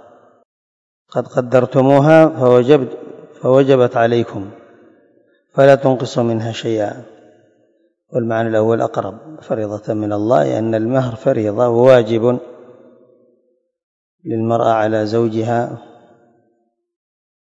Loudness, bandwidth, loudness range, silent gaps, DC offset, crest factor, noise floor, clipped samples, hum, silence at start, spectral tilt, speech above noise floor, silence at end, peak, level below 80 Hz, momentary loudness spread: -15 LUFS; 8 kHz; 7 LU; 13.83-14.18 s; under 0.1%; 16 dB; -64 dBFS; 0.2%; none; 1.15 s; -7.5 dB/octave; 50 dB; 1.75 s; 0 dBFS; -60 dBFS; 14 LU